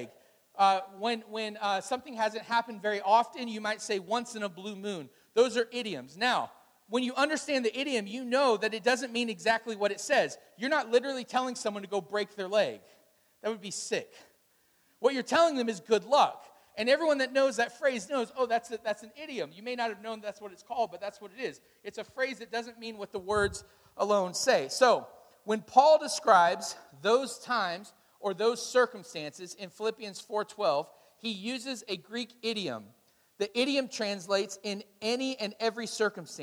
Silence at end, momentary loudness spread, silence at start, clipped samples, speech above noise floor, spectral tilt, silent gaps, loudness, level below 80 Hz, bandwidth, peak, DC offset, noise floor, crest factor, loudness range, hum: 0 s; 14 LU; 0 s; under 0.1%; 38 dB; -3 dB/octave; none; -30 LUFS; -68 dBFS; over 20 kHz; -8 dBFS; under 0.1%; -69 dBFS; 22 dB; 8 LU; none